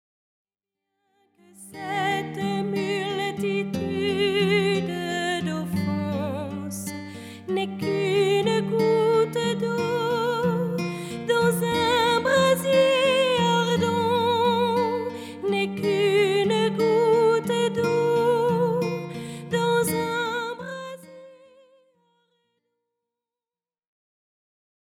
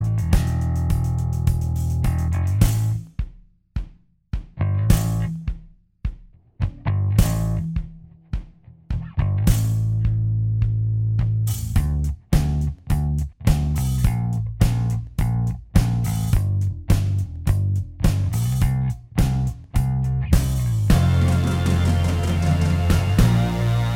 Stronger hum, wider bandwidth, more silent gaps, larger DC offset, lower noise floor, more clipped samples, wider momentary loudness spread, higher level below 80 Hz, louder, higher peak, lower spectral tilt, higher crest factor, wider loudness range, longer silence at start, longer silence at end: neither; about the same, 17 kHz vs 17 kHz; neither; neither; first, under -90 dBFS vs -45 dBFS; neither; about the same, 12 LU vs 12 LU; second, -62 dBFS vs -26 dBFS; about the same, -23 LUFS vs -22 LUFS; second, -10 dBFS vs -2 dBFS; second, -5 dB/octave vs -6.5 dB/octave; about the same, 16 dB vs 18 dB; about the same, 7 LU vs 6 LU; first, 1.6 s vs 0 s; first, 3.65 s vs 0 s